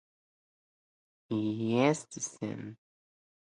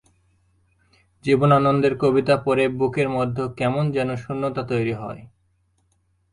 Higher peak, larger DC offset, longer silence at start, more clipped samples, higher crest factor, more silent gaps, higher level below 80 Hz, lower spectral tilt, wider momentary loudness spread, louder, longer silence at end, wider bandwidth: second, -12 dBFS vs -4 dBFS; neither; about the same, 1.3 s vs 1.25 s; neither; about the same, 22 dB vs 18 dB; neither; second, -76 dBFS vs -54 dBFS; second, -5.5 dB/octave vs -7.5 dB/octave; first, 13 LU vs 10 LU; second, -32 LUFS vs -21 LUFS; second, 0.7 s vs 1.05 s; about the same, 11 kHz vs 11 kHz